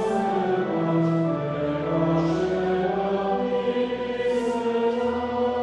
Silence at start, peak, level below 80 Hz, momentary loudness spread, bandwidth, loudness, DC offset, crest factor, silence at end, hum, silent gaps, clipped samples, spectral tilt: 0 s; -10 dBFS; -52 dBFS; 3 LU; 10.5 kHz; -24 LUFS; under 0.1%; 14 dB; 0 s; none; none; under 0.1%; -7.5 dB/octave